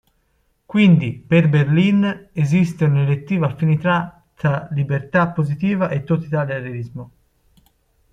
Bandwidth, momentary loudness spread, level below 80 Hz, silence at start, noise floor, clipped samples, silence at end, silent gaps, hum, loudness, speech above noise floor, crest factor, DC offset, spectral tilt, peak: 7.8 kHz; 9 LU; -52 dBFS; 0.7 s; -64 dBFS; under 0.1%; 1.05 s; none; none; -18 LUFS; 47 dB; 16 dB; under 0.1%; -8.5 dB/octave; -2 dBFS